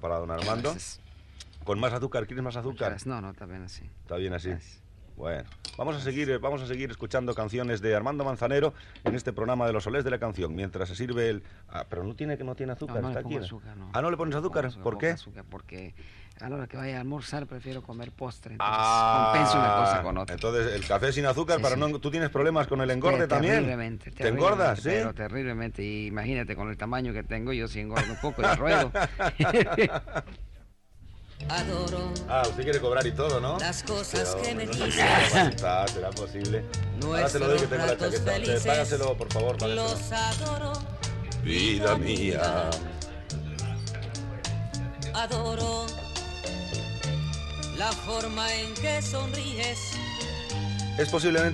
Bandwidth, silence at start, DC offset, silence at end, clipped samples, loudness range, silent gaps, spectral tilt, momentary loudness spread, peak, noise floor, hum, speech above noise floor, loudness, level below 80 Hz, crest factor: 12.5 kHz; 0 s; under 0.1%; 0 s; under 0.1%; 8 LU; none; -4.5 dB/octave; 13 LU; -10 dBFS; -51 dBFS; none; 23 dB; -28 LUFS; -44 dBFS; 18 dB